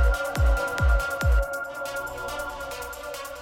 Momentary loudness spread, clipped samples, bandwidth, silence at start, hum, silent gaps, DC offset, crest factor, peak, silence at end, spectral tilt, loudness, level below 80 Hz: 10 LU; under 0.1%; 16.5 kHz; 0 s; none; none; under 0.1%; 12 dB; -14 dBFS; 0 s; -5 dB/octave; -27 LUFS; -26 dBFS